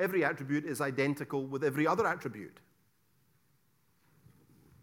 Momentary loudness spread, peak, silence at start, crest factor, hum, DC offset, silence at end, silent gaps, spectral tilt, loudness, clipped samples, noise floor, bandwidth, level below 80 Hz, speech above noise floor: 12 LU; -14 dBFS; 0 s; 20 dB; none; under 0.1%; 2.35 s; none; -6 dB/octave; -33 LUFS; under 0.1%; -73 dBFS; 17.5 kHz; -76 dBFS; 40 dB